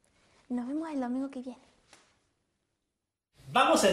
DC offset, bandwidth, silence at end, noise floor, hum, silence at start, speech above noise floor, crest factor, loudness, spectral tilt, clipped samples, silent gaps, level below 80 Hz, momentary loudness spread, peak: under 0.1%; 15 kHz; 0 s; -86 dBFS; none; 0.5 s; 57 dB; 22 dB; -30 LUFS; -3 dB/octave; under 0.1%; none; -70 dBFS; 16 LU; -12 dBFS